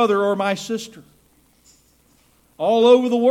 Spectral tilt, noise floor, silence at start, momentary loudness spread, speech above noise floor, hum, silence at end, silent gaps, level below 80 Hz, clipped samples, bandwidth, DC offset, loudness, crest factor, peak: -5 dB/octave; -57 dBFS; 0 s; 15 LU; 40 dB; none; 0 s; none; -64 dBFS; under 0.1%; 13.5 kHz; under 0.1%; -18 LUFS; 18 dB; -2 dBFS